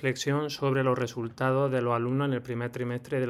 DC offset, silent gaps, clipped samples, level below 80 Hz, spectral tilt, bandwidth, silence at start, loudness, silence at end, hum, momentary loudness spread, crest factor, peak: under 0.1%; none; under 0.1%; -66 dBFS; -6.5 dB/octave; 15 kHz; 0 s; -29 LUFS; 0 s; none; 7 LU; 14 dB; -14 dBFS